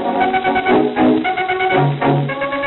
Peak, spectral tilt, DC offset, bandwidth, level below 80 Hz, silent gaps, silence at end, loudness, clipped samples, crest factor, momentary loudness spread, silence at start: -2 dBFS; -4.5 dB/octave; under 0.1%; 4.2 kHz; -48 dBFS; none; 0 s; -15 LUFS; under 0.1%; 14 dB; 4 LU; 0 s